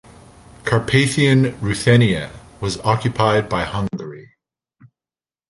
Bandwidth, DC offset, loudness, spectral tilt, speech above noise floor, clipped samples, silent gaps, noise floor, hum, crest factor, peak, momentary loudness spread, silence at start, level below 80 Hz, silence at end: 11.5 kHz; under 0.1%; -18 LUFS; -5.5 dB/octave; over 73 dB; under 0.1%; none; under -90 dBFS; none; 20 dB; 0 dBFS; 13 LU; 0.65 s; -44 dBFS; 1.3 s